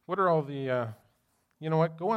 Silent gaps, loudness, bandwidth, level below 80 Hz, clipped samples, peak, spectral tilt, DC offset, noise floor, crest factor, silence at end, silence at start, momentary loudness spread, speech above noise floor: none; -29 LUFS; 5.8 kHz; -78 dBFS; under 0.1%; -14 dBFS; -9 dB/octave; under 0.1%; -73 dBFS; 16 dB; 0 s; 0.1 s; 11 LU; 44 dB